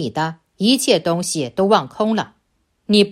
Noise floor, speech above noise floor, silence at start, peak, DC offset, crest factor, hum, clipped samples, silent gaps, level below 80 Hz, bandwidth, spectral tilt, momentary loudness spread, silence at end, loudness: -66 dBFS; 48 dB; 0 s; 0 dBFS; under 0.1%; 18 dB; none; under 0.1%; none; -60 dBFS; 14.5 kHz; -4.5 dB/octave; 8 LU; 0 s; -18 LUFS